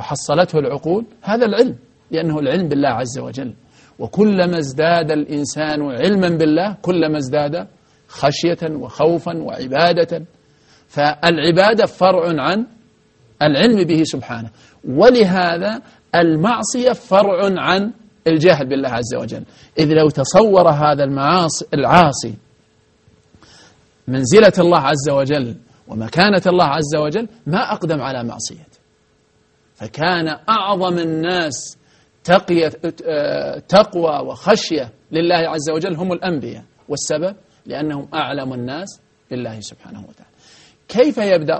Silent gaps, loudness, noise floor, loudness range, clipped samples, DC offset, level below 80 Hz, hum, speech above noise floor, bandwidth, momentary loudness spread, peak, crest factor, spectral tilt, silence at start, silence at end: none; -16 LUFS; -58 dBFS; 7 LU; under 0.1%; under 0.1%; -52 dBFS; none; 42 dB; 8.8 kHz; 15 LU; 0 dBFS; 16 dB; -5 dB/octave; 0 s; 0 s